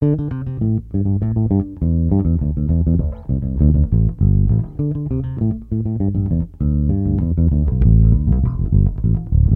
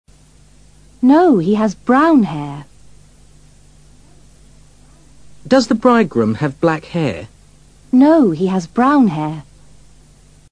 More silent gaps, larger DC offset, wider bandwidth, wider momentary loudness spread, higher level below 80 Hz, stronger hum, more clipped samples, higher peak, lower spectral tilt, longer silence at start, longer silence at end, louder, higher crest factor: neither; second, under 0.1% vs 0.3%; second, 2 kHz vs 10 kHz; second, 7 LU vs 13 LU; first, -22 dBFS vs -48 dBFS; second, none vs 50 Hz at -45 dBFS; neither; about the same, -2 dBFS vs 0 dBFS; first, -14 dB/octave vs -7 dB/octave; second, 0 s vs 1.05 s; second, 0 s vs 1.1 s; second, -18 LUFS vs -14 LUFS; about the same, 14 dB vs 16 dB